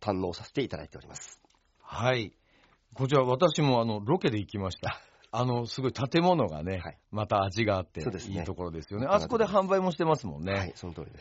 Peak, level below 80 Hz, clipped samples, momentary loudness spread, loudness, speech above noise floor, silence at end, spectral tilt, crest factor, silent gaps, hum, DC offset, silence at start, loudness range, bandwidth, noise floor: -10 dBFS; -58 dBFS; under 0.1%; 16 LU; -29 LUFS; 36 dB; 0 s; -5.5 dB/octave; 20 dB; none; none; under 0.1%; 0 s; 2 LU; 8 kHz; -64 dBFS